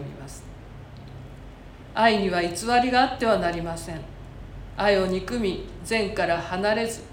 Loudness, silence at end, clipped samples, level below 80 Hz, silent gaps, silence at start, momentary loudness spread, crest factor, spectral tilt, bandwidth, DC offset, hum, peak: -24 LUFS; 0 s; under 0.1%; -44 dBFS; none; 0 s; 22 LU; 20 dB; -4.5 dB/octave; 17 kHz; under 0.1%; none; -6 dBFS